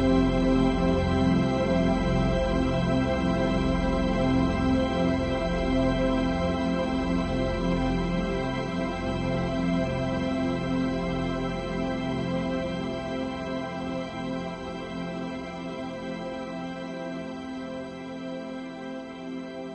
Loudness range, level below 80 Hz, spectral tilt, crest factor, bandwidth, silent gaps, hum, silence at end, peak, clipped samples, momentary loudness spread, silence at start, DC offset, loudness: 10 LU; -38 dBFS; -7 dB/octave; 16 dB; 8.6 kHz; none; none; 0 s; -10 dBFS; under 0.1%; 11 LU; 0 s; under 0.1%; -28 LUFS